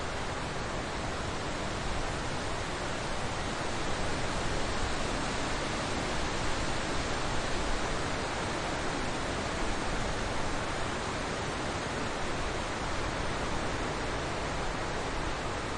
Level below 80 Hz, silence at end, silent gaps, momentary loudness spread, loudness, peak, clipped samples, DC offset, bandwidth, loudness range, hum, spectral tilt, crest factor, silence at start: -40 dBFS; 0 s; none; 2 LU; -34 LUFS; -18 dBFS; under 0.1%; under 0.1%; 11 kHz; 1 LU; none; -4 dB/octave; 14 dB; 0 s